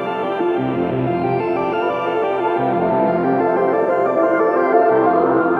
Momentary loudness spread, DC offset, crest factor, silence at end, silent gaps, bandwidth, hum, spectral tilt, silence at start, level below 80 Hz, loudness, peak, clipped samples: 5 LU; under 0.1%; 14 dB; 0 s; none; 5.6 kHz; none; -9 dB/octave; 0 s; -54 dBFS; -17 LUFS; -2 dBFS; under 0.1%